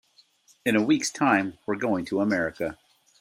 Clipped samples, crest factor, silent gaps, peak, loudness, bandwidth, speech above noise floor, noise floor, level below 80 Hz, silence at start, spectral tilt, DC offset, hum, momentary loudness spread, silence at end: under 0.1%; 20 dB; none; -6 dBFS; -25 LUFS; 15 kHz; 36 dB; -60 dBFS; -64 dBFS; 0.65 s; -4.5 dB/octave; under 0.1%; none; 8 LU; 0.45 s